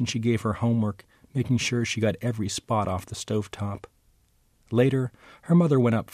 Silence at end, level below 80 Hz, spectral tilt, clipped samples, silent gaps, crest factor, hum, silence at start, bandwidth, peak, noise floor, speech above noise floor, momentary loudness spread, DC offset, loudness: 0.1 s; -56 dBFS; -6 dB/octave; under 0.1%; none; 16 dB; none; 0 s; 14 kHz; -10 dBFS; -64 dBFS; 39 dB; 12 LU; under 0.1%; -26 LUFS